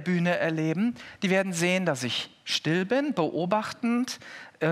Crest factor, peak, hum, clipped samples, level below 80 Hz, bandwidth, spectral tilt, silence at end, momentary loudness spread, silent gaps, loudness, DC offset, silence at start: 16 dB; -12 dBFS; none; under 0.1%; -76 dBFS; 14.5 kHz; -5 dB/octave; 0 s; 6 LU; none; -27 LUFS; under 0.1%; 0 s